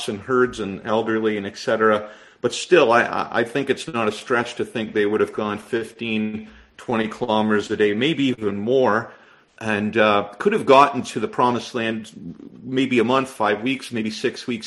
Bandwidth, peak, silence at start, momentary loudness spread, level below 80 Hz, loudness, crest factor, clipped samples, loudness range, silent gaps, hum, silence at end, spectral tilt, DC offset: 12 kHz; 0 dBFS; 0 s; 10 LU; -58 dBFS; -21 LUFS; 20 dB; under 0.1%; 4 LU; none; none; 0 s; -5 dB/octave; under 0.1%